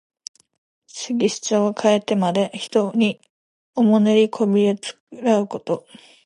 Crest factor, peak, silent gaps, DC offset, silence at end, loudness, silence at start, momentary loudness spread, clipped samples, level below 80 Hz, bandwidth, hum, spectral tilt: 16 dB; -4 dBFS; 3.30-3.73 s, 5.00-5.07 s; under 0.1%; 0.45 s; -20 LUFS; 0.95 s; 16 LU; under 0.1%; -72 dBFS; 11.5 kHz; none; -5.5 dB/octave